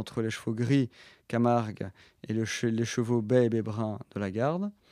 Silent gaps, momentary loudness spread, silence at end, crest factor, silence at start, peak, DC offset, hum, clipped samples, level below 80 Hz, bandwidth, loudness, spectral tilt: none; 10 LU; 0.2 s; 18 dB; 0 s; -10 dBFS; under 0.1%; none; under 0.1%; -70 dBFS; 13.5 kHz; -29 LUFS; -6.5 dB/octave